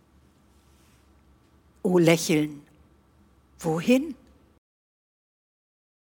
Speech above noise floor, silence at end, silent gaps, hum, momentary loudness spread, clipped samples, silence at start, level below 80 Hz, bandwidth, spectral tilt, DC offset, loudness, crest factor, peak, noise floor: 37 dB; 2 s; none; none; 18 LU; under 0.1%; 1.85 s; -62 dBFS; 19 kHz; -5.5 dB/octave; under 0.1%; -24 LUFS; 22 dB; -6 dBFS; -60 dBFS